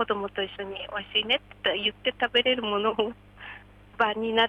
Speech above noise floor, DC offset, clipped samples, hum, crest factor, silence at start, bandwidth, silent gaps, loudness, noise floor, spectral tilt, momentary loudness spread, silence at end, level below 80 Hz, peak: 20 dB; under 0.1%; under 0.1%; 50 Hz at -55 dBFS; 18 dB; 0 s; 9 kHz; none; -27 LUFS; -48 dBFS; -5 dB/octave; 20 LU; 0 s; -58 dBFS; -10 dBFS